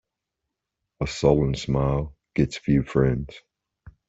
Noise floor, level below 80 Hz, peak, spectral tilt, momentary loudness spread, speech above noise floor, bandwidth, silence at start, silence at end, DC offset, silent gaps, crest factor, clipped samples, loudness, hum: -83 dBFS; -40 dBFS; -4 dBFS; -7 dB/octave; 10 LU; 61 dB; 8 kHz; 1 s; 0.7 s; under 0.1%; none; 20 dB; under 0.1%; -24 LUFS; none